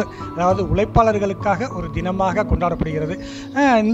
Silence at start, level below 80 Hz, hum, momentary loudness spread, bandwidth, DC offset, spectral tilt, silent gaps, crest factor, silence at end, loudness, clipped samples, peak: 0 s; -32 dBFS; none; 9 LU; 8.2 kHz; under 0.1%; -7 dB/octave; none; 16 dB; 0 s; -20 LUFS; under 0.1%; -2 dBFS